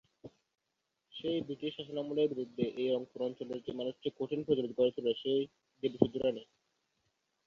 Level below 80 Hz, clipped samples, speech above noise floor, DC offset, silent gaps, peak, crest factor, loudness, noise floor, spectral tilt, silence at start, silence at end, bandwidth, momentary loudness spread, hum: -72 dBFS; under 0.1%; 50 dB; under 0.1%; none; -10 dBFS; 26 dB; -35 LUFS; -85 dBFS; -7.5 dB/octave; 0.25 s; 1.05 s; 7 kHz; 9 LU; none